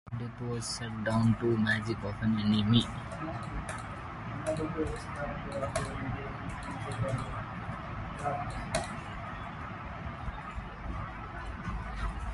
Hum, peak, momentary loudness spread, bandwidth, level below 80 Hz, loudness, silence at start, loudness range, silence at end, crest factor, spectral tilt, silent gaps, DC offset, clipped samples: none; -12 dBFS; 12 LU; 11.5 kHz; -46 dBFS; -34 LUFS; 0.05 s; 9 LU; 0 s; 22 dB; -5.5 dB/octave; none; under 0.1%; under 0.1%